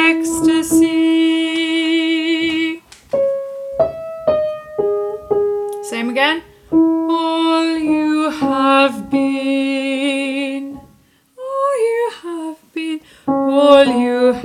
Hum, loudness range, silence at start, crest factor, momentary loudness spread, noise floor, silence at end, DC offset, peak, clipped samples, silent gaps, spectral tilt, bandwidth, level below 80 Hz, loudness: none; 4 LU; 0 s; 16 dB; 11 LU; -52 dBFS; 0 s; under 0.1%; 0 dBFS; under 0.1%; none; -3.5 dB/octave; 14 kHz; -52 dBFS; -16 LUFS